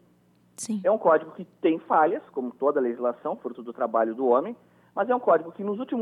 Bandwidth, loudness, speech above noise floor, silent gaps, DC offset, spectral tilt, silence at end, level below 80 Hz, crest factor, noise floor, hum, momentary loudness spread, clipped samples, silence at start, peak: 12.5 kHz; -25 LUFS; 36 dB; none; under 0.1%; -5.5 dB/octave; 0 s; -82 dBFS; 18 dB; -61 dBFS; 60 Hz at -65 dBFS; 14 LU; under 0.1%; 0.6 s; -8 dBFS